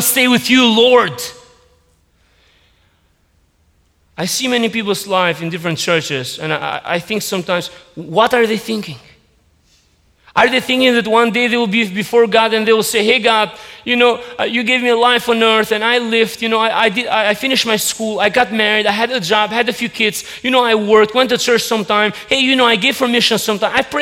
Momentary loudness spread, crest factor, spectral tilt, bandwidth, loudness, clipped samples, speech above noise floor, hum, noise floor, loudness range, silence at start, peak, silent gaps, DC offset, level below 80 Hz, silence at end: 9 LU; 14 dB; -3 dB/octave; 17.5 kHz; -14 LUFS; under 0.1%; 43 dB; none; -57 dBFS; 6 LU; 0 s; 0 dBFS; none; under 0.1%; -54 dBFS; 0 s